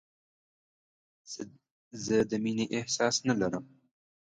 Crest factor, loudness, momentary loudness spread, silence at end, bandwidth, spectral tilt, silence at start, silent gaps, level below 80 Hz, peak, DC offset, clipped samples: 22 dB; -30 LUFS; 16 LU; 0.65 s; 9.6 kHz; -4 dB/octave; 1.25 s; 1.71-1.91 s; -66 dBFS; -12 dBFS; under 0.1%; under 0.1%